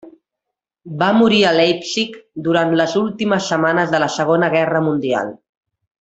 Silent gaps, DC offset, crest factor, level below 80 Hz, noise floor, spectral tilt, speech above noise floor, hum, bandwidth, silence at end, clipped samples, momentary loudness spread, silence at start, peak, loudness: none; under 0.1%; 16 dB; -58 dBFS; -81 dBFS; -5 dB/octave; 65 dB; none; 8.2 kHz; 0.65 s; under 0.1%; 9 LU; 0.05 s; 0 dBFS; -16 LUFS